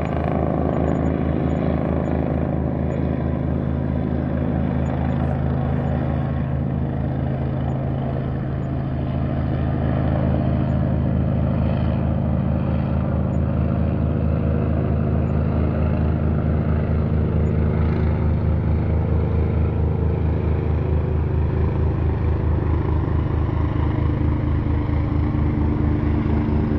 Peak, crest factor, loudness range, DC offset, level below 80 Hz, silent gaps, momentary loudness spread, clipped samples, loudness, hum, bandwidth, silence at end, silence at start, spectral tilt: -6 dBFS; 14 dB; 2 LU; under 0.1%; -28 dBFS; none; 3 LU; under 0.1%; -21 LUFS; none; 4.5 kHz; 0 s; 0 s; -11 dB/octave